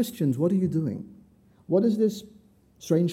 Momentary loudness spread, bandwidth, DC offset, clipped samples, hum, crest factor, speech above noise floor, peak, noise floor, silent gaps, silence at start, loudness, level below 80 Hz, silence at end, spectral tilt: 17 LU; 16 kHz; under 0.1%; under 0.1%; none; 16 dB; 32 dB; -10 dBFS; -56 dBFS; none; 0 s; -25 LUFS; -66 dBFS; 0 s; -8 dB/octave